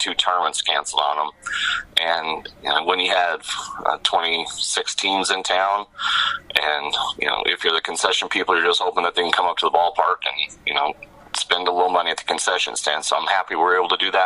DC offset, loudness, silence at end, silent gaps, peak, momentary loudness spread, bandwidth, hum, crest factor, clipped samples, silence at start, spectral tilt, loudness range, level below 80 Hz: under 0.1%; -20 LUFS; 0 s; none; 0 dBFS; 5 LU; 14.5 kHz; none; 22 dB; under 0.1%; 0 s; 0 dB/octave; 2 LU; -58 dBFS